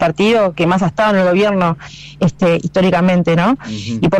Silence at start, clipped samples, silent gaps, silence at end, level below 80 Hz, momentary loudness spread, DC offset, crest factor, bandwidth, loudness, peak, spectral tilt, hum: 0 s; under 0.1%; none; 0 s; -44 dBFS; 7 LU; under 0.1%; 6 dB; 9.6 kHz; -14 LUFS; -6 dBFS; -7 dB/octave; none